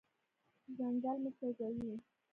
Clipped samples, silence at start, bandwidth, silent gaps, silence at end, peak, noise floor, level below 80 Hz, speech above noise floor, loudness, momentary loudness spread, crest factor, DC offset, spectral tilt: under 0.1%; 0.7 s; 3.5 kHz; none; 0.3 s; -28 dBFS; -81 dBFS; -76 dBFS; 41 dB; -42 LUFS; 11 LU; 14 dB; under 0.1%; -9 dB/octave